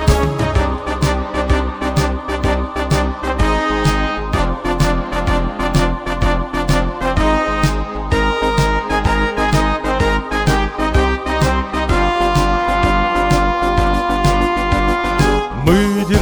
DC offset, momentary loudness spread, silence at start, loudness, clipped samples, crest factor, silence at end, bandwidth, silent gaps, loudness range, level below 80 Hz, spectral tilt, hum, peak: under 0.1%; 4 LU; 0 s; -16 LUFS; under 0.1%; 14 dB; 0 s; over 20 kHz; none; 2 LU; -20 dBFS; -6 dB/octave; none; 0 dBFS